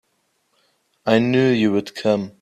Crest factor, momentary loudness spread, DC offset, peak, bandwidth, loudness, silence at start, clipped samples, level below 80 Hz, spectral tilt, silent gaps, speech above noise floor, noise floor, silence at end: 20 dB; 5 LU; under 0.1%; -2 dBFS; 13 kHz; -19 LUFS; 1.05 s; under 0.1%; -62 dBFS; -6.5 dB/octave; none; 50 dB; -68 dBFS; 0.1 s